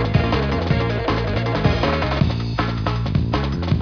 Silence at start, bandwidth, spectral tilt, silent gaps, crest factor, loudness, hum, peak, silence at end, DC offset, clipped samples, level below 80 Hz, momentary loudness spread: 0 s; 5.4 kHz; -7.5 dB/octave; none; 16 dB; -21 LUFS; none; -4 dBFS; 0 s; 0.2%; under 0.1%; -28 dBFS; 3 LU